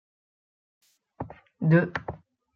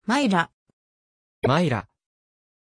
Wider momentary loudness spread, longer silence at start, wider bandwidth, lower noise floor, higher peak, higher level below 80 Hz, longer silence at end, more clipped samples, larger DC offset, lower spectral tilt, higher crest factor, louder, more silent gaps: first, 19 LU vs 9 LU; first, 1.2 s vs 0.1 s; second, 5.4 kHz vs 11 kHz; second, -42 dBFS vs under -90 dBFS; about the same, -8 dBFS vs -6 dBFS; about the same, -62 dBFS vs -58 dBFS; second, 0.4 s vs 0.95 s; neither; neither; first, -9.5 dB/octave vs -6 dB/octave; about the same, 20 dB vs 20 dB; about the same, -25 LUFS vs -23 LUFS; second, none vs 0.53-0.66 s, 0.73-1.42 s